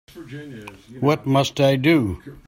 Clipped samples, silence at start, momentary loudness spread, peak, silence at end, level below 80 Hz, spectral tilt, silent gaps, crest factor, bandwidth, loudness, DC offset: under 0.1%; 0.15 s; 20 LU; -4 dBFS; 0.15 s; -52 dBFS; -6.5 dB/octave; none; 16 dB; 16.5 kHz; -19 LUFS; under 0.1%